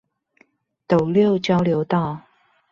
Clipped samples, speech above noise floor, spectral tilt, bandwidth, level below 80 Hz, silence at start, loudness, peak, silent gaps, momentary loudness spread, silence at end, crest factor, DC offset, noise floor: under 0.1%; 42 dB; -8 dB/octave; 7.4 kHz; -56 dBFS; 0.9 s; -20 LUFS; -4 dBFS; none; 8 LU; 0.5 s; 18 dB; under 0.1%; -60 dBFS